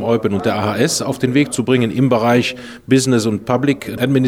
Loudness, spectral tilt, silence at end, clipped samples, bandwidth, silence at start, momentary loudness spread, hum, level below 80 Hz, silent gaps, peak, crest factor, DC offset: -16 LUFS; -5.5 dB/octave; 0 s; under 0.1%; 16.5 kHz; 0 s; 4 LU; none; -52 dBFS; none; -2 dBFS; 14 dB; 0.1%